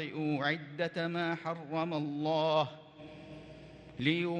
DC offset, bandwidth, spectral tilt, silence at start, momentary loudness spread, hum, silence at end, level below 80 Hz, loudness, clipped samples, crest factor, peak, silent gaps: under 0.1%; 9 kHz; -7 dB/octave; 0 s; 20 LU; none; 0 s; -70 dBFS; -34 LUFS; under 0.1%; 20 dB; -14 dBFS; none